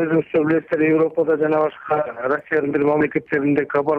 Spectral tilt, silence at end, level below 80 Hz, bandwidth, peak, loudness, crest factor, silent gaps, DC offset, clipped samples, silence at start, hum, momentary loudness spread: -9.5 dB/octave; 0 s; -60 dBFS; 4.5 kHz; -6 dBFS; -19 LUFS; 12 dB; none; under 0.1%; under 0.1%; 0 s; none; 4 LU